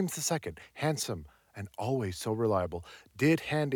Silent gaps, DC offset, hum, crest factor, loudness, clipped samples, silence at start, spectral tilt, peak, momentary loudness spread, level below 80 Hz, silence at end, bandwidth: none; under 0.1%; none; 18 dB; -32 LUFS; under 0.1%; 0 s; -5 dB/octave; -14 dBFS; 16 LU; -60 dBFS; 0 s; 19 kHz